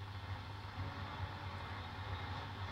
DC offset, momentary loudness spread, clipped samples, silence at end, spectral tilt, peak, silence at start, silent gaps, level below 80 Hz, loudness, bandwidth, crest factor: under 0.1%; 3 LU; under 0.1%; 0 s; -6 dB/octave; -30 dBFS; 0 s; none; -58 dBFS; -46 LUFS; 12.5 kHz; 14 dB